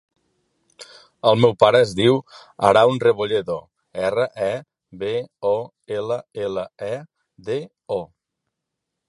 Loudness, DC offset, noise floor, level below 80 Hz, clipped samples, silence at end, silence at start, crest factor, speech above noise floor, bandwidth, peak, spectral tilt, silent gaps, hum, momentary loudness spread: -21 LUFS; under 0.1%; -81 dBFS; -58 dBFS; under 0.1%; 1 s; 0.8 s; 22 dB; 61 dB; 11.5 kHz; 0 dBFS; -6 dB/octave; none; none; 15 LU